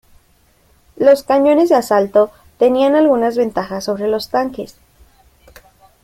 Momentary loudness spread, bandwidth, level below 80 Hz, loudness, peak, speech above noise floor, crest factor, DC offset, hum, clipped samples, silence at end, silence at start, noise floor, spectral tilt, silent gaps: 10 LU; 16 kHz; -52 dBFS; -15 LUFS; -2 dBFS; 41 dB; 14 dB; under 0.1%; none; under 0.1%; 1.35 s; 1 s; -54 dBFS; -5.5 dB/octave; none